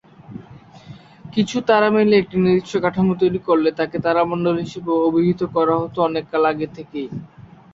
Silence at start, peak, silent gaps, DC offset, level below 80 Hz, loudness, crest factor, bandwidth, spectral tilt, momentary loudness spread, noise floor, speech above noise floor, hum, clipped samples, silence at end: 0.3 s; -2 dBFS; none; under 0.1%; -54 dBFS; -19 LUFS; 18 dB; 7.8 kHz; -7 dB/octave; 14 LU; -42 dBFS; 24 dB; none; under 0.1%; 0.3 s